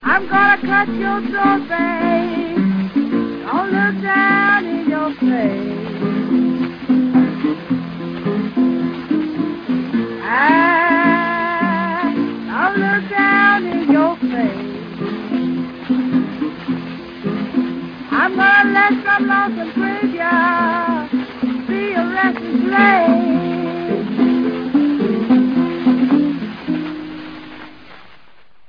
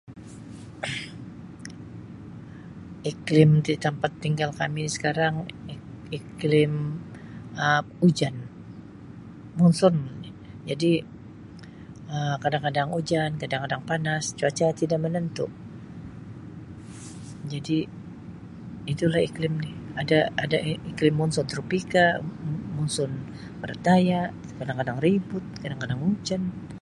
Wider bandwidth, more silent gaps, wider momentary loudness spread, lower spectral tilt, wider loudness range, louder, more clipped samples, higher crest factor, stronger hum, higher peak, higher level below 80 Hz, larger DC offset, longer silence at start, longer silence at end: second, 5.2 kHz vs 11.5 kHz; neither; second, 11 LU vs 21 LU; first, -8 dB/octave vs -6 dB/octave; about the same, 4 LU vs 6 LU; first, -16 LUFS vs -25 LUFS; neither; second, 16 dB vs 24 dB; neither; first, 0 dBFS vs -4 dBFS; about the same, -54 dBFS vs -56 dBFS; neither; about the same, 0 s vs 0.05 s; about the same, 0 s vs 0 s